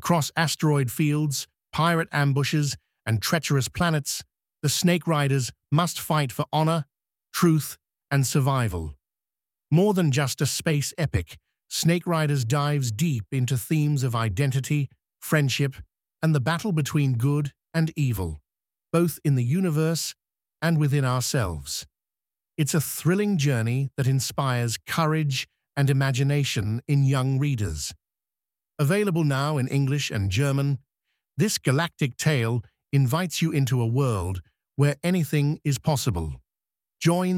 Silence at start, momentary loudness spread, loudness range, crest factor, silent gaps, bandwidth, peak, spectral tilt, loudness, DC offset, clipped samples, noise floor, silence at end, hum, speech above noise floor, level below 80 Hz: 0 s; 8 LU; 2 LU; 18 dB; none; 16.5 kHz; -6 dBFS; -5.5 dB/octave; -25 LUFS; under 0.1%; under 0.1%; under -90 dBFS; 0 s; none; over 67 dB; -50 dBFS